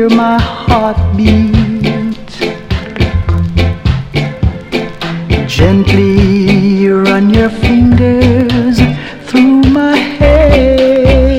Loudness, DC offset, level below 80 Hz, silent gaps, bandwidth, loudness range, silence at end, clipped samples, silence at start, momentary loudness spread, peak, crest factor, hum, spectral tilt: -10 LUFS; under 0.1%; -18 dBFS; none; 14.5 kHz; 6 LU; 0 s; 0.7%; 0 s; 10 LU; 0 dBFS; 8 dB; none; -7.5 dB/octave